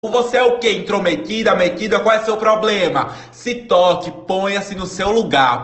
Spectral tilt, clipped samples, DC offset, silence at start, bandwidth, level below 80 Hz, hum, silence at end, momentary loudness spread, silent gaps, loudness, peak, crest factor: -4 dB/octave; under 0.1%; under 0.1%; 0.05 s; 8.4 kHz; -46 dBFS; none; 0 s; 8 LU; none; -16 LUFS; -2 dBFS; 14 dB